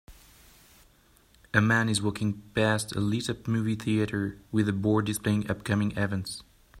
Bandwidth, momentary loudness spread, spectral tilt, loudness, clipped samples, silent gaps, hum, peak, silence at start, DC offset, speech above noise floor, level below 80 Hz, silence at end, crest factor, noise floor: 15 kHz; 7 LU; -5.5 dB/octave; -28 LUFS; under 0.1%; none; none; -4 dBFS; 0.1 s; under 0.1%; 34 dB; -56 dBFS; 0 s; 24 dB; -61 dBFS